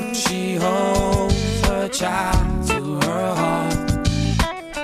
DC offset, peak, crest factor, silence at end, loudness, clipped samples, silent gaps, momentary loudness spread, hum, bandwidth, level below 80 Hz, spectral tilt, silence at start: under 0.1%; -6 dBFS; 14 dB; 0 s; -20 LUFS; under 0.1%; none; 3 LU; none; 15.5 kHz; -28 dBFS; -5 dB/octave; 0 s